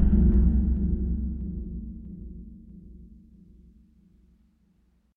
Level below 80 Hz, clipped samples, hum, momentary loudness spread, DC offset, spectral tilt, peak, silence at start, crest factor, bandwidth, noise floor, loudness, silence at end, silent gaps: -28 dBFS; under 0.1%; none; 26 LU; under 0.1%; -13.5 dB/octave; -8 dBFS; 0 s; 18 dB; 1.9 kHz; -65 dBFS; -26 LUFS; 2.1 s; none